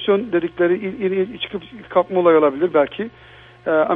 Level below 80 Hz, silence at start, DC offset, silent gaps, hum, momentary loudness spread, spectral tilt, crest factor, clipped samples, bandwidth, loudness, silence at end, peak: -56 dBFS; 0 s; under 0.1%; none; none; 14 LU; -9 dB/octave; 16 dB; under 0.1%; 3.9 kHz; -19 LUFS; 0 s; -2 dBFS